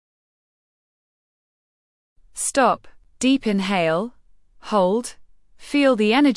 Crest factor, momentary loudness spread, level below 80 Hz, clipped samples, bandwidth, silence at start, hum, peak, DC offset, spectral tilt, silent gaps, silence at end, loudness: 18 dB; 11 LU; -56 dBFS; under 0.1%; 12 kHz; 2.35 s; none; -4 dBFS; under 0.1%; -4 dB/octave; none; 0 s; -20 LUFS